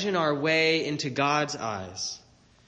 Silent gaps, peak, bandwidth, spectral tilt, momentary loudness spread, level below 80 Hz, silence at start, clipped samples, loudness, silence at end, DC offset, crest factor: none; -12 dBFS; 9.6 kHz; -4 dB/octave; 11 LU; -66 dBFS; 0 s; under 0.1%; -26 LUFS; 0.5 s; under 0.1%; 16 dB